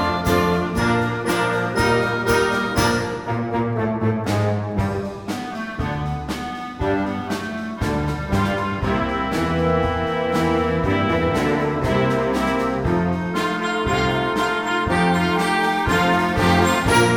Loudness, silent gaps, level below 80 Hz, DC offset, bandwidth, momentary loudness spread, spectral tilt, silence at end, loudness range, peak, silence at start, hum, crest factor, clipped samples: -21 LUFS; none; -36 dBFS; under 0.1%; 16.5 kHz; 8 LU; -5.5 dB/octave; 0 s; 5 LU; -4 dBFS; 0 s; none; 16 dB; under 0.1%